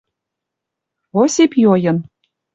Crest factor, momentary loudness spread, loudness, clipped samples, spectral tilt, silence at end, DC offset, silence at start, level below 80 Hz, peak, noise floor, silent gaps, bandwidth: 14 dB; 10 LU; -15 LUFS; under 0.1%; -5.5 dB/octave; 0.5 s; under 0.1%; 1.15 s; -60 dBFS; -2 dBFS; -81 dBFS; none; 8.2 kHz